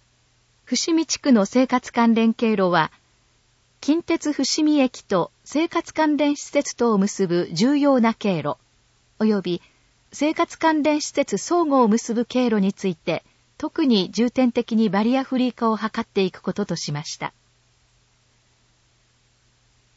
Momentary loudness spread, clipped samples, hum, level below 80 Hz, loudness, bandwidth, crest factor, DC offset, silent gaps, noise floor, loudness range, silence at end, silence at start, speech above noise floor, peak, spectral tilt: 9 LU; under 0.1%; none; -62 dBFS; -21 LUFS; 8 kHz; 18 dB; under 0.1%; none; -62 dBFS; 5 LU; 2.7 s; 0.7 s; 41 dB; -4 dBFS; -5 dB/octave